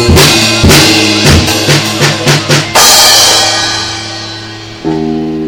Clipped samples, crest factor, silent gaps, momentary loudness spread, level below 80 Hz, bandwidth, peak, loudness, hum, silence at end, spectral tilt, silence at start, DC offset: 5%; 8 dB; none; 16 LU; -24 dBFS; over 20 kHz; 0 dBFS; -5 LUFS; none; 0 s; -3 dB/octave; 0 s; under 0.1%